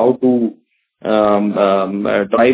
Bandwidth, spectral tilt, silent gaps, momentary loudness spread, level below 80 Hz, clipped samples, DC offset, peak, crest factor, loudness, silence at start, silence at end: 4 kHz; -10.5 dB/octave; none; 5 LU; -54 dBFS; under 0.1%; under 0.1%; 0 dBFS; 14 dB; -15 LUFS; 0 s; 0 s